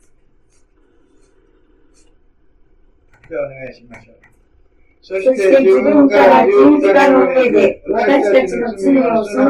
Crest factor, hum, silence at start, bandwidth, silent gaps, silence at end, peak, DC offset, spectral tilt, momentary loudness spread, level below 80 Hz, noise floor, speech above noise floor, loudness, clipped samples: 14 dB; none; 3.3 s; 11 kHz; none; 0 s; 0 dBFS; under 0.1%; -6 dB/octave; 16 LU; -50 dBFS; -52 dBFS; 41 dB; -11 LUFS; under 0.1%